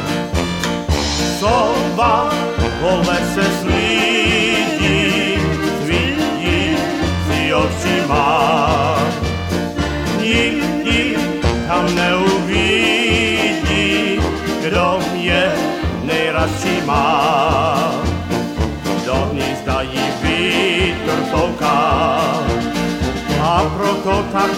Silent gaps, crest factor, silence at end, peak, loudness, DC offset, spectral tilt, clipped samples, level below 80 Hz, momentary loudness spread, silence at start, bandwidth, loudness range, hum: none; 14 dB; 0 s; -2 dBFS; -16 LUFS; under 0.1%; -5 dB/octave; under 0.1%; -30 dBFS; 6 LU; 0 s; 16.5 kHz; 2 LU; none